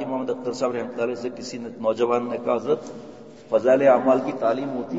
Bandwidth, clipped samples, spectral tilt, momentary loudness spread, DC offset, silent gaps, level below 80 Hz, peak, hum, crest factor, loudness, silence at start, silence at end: 8 kHz; under 0.1%; -6 dB/octave; 15 LU; 0.2%; none; -70 dBFS; -4 dBFS; none; 18 dB; -23 LUFS; 0 s; 0 s